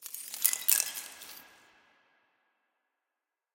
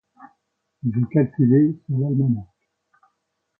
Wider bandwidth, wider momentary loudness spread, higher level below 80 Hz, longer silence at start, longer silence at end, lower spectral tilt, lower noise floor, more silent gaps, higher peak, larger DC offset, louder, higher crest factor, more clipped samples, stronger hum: first, 17 kHz vs 2.5 kHz; first, 22 LU vs 10 LU; second, -86 dBFS vs -58 dBFS; second, 0 s vs 0.2 s; first, 2.05 s vs 1.15 s; second, 3.5 dB/octave vs -14.5 dB/octave; first, -88 dBFS vs -75 dBFS; neither; first, -2 dBFS vs -6 dBFS; neither; second, -28 LUFS vs -21 LUFS; first, 34 dB vs 16 dB; neither; neither